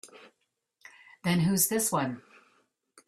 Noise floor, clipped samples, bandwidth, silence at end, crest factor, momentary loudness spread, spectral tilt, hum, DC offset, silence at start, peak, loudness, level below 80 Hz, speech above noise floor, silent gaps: -70 dBFS; under 0.1%; 15.5 kHz; 0.9 s; 20 dB; 11 LU; -4 dB/octave; none; under 0.1%; 0.05 s; -12 dBFS; -27 LUFS; -66 dBFS; 42 dB; none